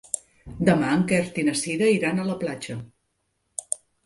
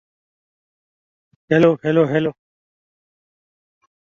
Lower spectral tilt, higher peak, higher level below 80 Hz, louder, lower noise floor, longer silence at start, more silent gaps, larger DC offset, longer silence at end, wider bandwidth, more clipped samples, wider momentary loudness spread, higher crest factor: second, -5 dB/octave vs -8 dB/octave; about the same, -4 dBFS vs -2 dBFS; first, -54 dBFS vs -62 dBFS; second, -24 LUFS vs -17 LUFS; second, -74 dBFS vs under -90 dBFS; second, 0.15 s vs 1.5 s; neither; neither; second, 0.3 s vs 1.75 s; first, 11.5 kHz vs 7.2 kHz; neither; first, 15 LU vs 6 LU; about the same, 20 dB vs 20 dB